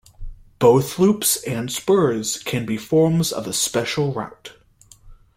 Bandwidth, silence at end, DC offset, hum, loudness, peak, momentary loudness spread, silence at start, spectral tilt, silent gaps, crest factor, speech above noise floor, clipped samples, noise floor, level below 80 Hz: 16.5 kHz; 0.25 s; under 0.1%; none; -20 LUFS; -2 dBFS; 9 LU; 0.2 s; -4.5 dB/octave; none; 18 dB; 31 dB; under 0.1%; -50 dBFS; -44 dBFS